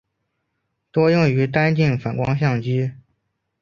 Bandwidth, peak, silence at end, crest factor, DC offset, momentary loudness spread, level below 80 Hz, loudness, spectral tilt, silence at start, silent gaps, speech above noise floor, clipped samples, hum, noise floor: 7 kHz; -2 dBFS; 0.65 s; 18 dB; under 0.1%; 7 LU; -52 dBFS; -19 LUFS; -8 dB/octave; 0.95 s; none; 56 dB; under 0.1%; none; -74 dBFS